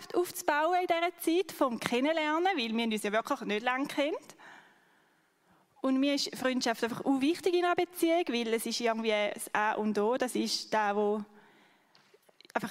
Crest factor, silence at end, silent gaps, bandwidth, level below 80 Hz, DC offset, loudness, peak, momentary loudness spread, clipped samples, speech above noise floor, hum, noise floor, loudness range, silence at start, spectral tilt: 22 dB; 0 s; none; 16 kHz; -80 dBFS; under 0.1%; -30 LUFS; -8 dBFS; 4 LU; under 0.1%; 39 dB; none; -69 dBFS; 4 LU; 0 s; -3.5 dB/octave